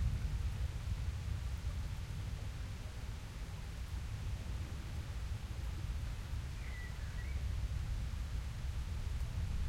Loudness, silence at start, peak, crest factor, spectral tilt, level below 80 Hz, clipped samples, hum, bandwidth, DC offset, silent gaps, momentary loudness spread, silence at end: -43 LUFS; 0 s; -26 dBFS; 14 dB; -5.5 dB/octave; -42 dBFS; under 0.1%; none; 16 kHz; under 0.1%; none; 5 LU; 0 s